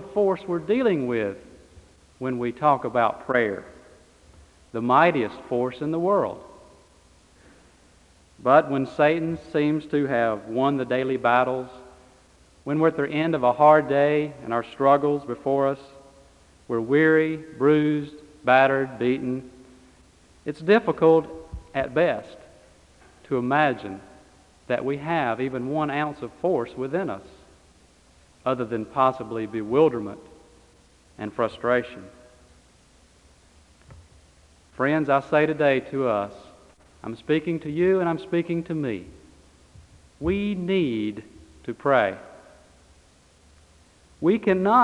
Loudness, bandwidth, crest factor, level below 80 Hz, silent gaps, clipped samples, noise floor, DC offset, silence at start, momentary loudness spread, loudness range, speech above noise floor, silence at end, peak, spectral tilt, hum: -23 LUFS; 11 kHz; 22 dB; -56 dBFS; none; under 0.1%; -56 dBFS; under 0.1%; 0 s; 14 LU; 7 LU; 34 dB; 0 s; -2 dBFS; -7.5 dB/octave; none